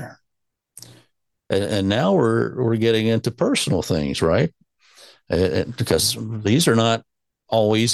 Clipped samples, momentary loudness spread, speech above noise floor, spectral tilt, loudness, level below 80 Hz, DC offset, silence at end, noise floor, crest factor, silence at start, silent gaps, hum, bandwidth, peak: under 0.1%; 7 LU; 60 dB; -5 dB/octave; -20 LUFS; -48 dBFS; under 0.1%; 0 s; -79 dBFS; 18 dB; 0 s; none; none; 13 kHz; -4 dBFS